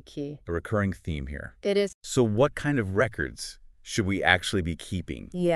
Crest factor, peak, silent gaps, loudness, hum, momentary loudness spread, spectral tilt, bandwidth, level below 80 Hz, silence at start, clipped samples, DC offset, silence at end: 24 dB; -2 dBFS; 1.94-2.01 s; -27 LUFS; none; 14 LU; -5 dB/octave; 13.5 kHz; -46 dBFS; 0.1 s; under 0.1%; under 0.1%; 0 s